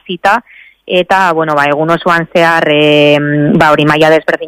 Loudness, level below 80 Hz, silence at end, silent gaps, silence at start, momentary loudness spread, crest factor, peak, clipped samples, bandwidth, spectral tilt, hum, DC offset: -9 LUFS; -46 dBFS; 0 s; none; 0.1 s; 4 LU; 10 dB; 0 dBFS; 0.7%; 16 kHz; -6 dB/octave; none; under 0.1%